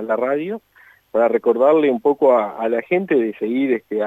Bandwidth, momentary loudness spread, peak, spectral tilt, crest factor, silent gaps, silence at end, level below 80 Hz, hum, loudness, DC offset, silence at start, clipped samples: 12.5 kHz; 8 LU; -4 dBFS; -8 dB/octave; 14 dB; none; 0 s; -72 dBFS; none; -18 LUFS; under 0.1%; 0 s; under 0.1%